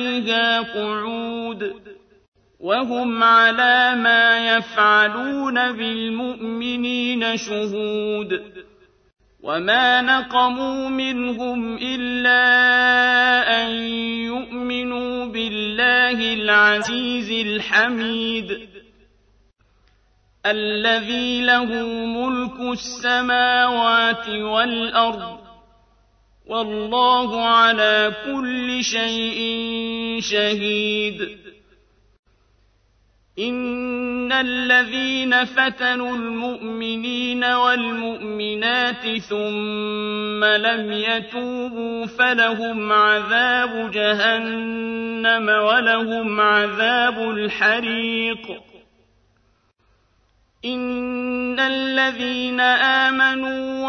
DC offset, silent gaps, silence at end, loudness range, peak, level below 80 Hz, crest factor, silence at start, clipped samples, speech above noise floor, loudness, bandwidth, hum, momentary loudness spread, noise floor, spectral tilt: under 0.1%; 2.28-2.32 s, 32.19-32.23 s; 0 s; 7 LU; -4 dBFS; -56 dBFS; 18 dB; 0 s; under 0.1%; 43 dB; -19 LUFS; 6.8 kHz; none; 12 LU; -62 dBFS; -3 dB/octave